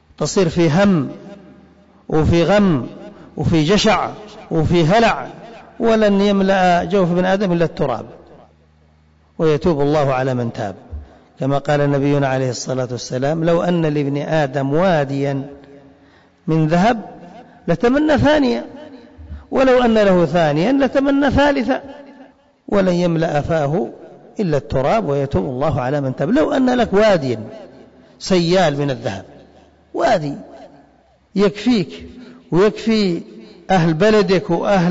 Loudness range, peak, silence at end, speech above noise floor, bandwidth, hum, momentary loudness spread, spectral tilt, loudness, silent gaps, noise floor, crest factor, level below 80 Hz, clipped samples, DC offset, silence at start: 4 LU; -6 dBFS; 0 s; 37 dB; 7.8 kHz; none; 14 LU; -6.5 dB/octave; -17 LUFS; none; -53 dBFS; 10 dB; -40 dBFS; under 0.1%; under 0.1%; 0.2 s